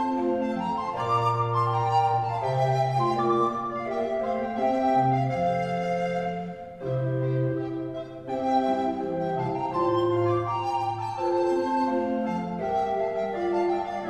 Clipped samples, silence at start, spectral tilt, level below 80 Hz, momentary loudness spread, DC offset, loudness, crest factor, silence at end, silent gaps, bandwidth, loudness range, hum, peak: under 0.1%; 0 s; -8 dB/octave; -58 dBFS; 6 LU; under 0.1%; -26 LUFS; 14 dB; 0 s; none; 10 kHz; 3 LU; none; -12 dBFS